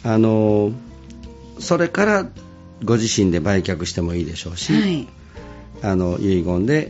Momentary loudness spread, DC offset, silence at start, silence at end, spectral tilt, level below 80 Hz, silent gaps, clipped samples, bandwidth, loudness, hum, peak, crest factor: 22 LU; under 0.1%; 0 s; 0 s; -5.5 dB/octave; -42 dBFS; none; under 0.1%; 8 kHz; -19 LUFS; none; -4 dBFS; 16 dB